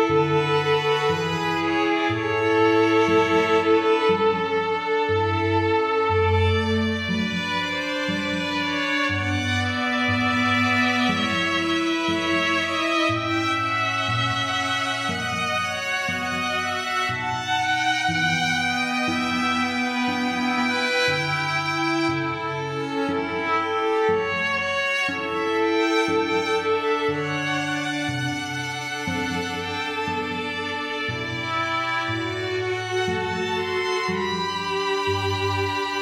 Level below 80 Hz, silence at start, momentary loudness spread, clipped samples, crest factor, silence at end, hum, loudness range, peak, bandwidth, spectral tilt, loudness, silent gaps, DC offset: -56 dBFS; 0 s; 6 LU; under 0.1%; 16 dB; 0 s; none; 5 LU; -8 dBFS; 14.5 kHz; -4.5 dB/octave; -22 LUFS; none; under 0.1%